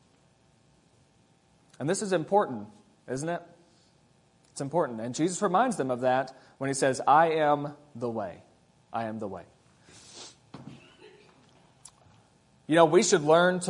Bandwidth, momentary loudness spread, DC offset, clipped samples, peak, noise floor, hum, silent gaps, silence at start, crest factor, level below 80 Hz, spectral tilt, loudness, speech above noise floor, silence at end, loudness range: 11 kHz; 24 LU; under 0.1%; under 0.1%; -6 dBFS; -64 dBFS; none; none; 1.8 s; 24 dB; -74 dBFS; -4.5 dB/octave; -27 LUFS; 38 dB; 0 s; 15 LU